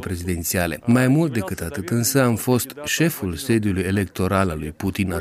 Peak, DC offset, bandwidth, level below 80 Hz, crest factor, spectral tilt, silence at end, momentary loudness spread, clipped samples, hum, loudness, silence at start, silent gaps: -4 dBFS; under 0.1%; 16 kHz; -44 dBFS; 16 dB; -5 dB/octave; 0 s; 8 LU; under 0.1%; none; -21 LUFS; 0 s; none